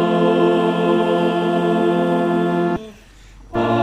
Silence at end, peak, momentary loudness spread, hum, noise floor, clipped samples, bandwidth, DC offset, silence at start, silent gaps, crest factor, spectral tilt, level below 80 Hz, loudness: 0 s; -4 dBFS; 7 LU; none; -43 dBFS; under 0.1%; 10 kHz; under 0.1%; 0 s; none; 14 dB; -7.5 dB/octave; -48 dBFS; -18 LUFS